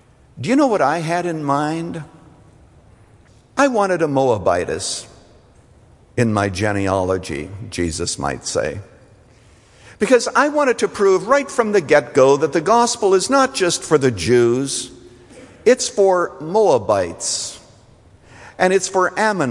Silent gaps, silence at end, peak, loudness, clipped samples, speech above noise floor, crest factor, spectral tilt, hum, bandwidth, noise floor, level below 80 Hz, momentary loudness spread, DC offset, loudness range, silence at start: none; 0 s; -2 dBFS; -17 LUFS; under 0.1%; 32 dB; 18 dB; -4.5 dB/octave; none; 11.5 kHz; -49 dBFS; -52 dBFS; 10 LU; under 0.1%; 7 LU; 0.35 s